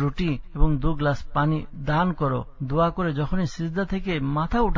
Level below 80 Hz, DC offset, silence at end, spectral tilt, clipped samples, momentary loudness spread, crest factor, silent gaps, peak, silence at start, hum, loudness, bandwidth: -32 dBFS; under 0.1%; 0 s; -8 dB/octave; under 0.1%; 4 LU; 18 dB; none; -4 dBFS; 0 s; none; -25 LUFS; 7.4 kHz